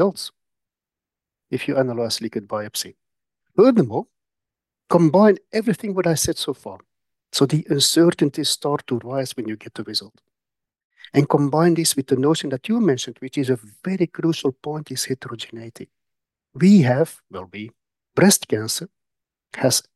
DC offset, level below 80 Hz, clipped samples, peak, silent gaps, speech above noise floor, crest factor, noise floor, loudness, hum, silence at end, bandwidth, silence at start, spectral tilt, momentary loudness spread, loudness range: under 0.1%; -60 dBFS; under 0.1%; -4 dBFS; 10.84-10.90 s; 69 dB; 18 dB; -89 dBFS; -20 LUFS; none; 0.15 s; 12.5 kHz; 0 s; -5 dB/octave; 17 LU; 5 LU